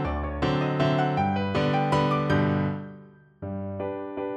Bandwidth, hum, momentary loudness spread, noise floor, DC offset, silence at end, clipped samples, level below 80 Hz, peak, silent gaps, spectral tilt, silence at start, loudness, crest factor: 9 kHz; none; 12 LU; -49 dBFS; under 0.1%; 0 s; under 0.1%; -42 dBFS; -12 dBFS; none; -7.5 dB/octave; 0 s; -26 LUFS; 14 dB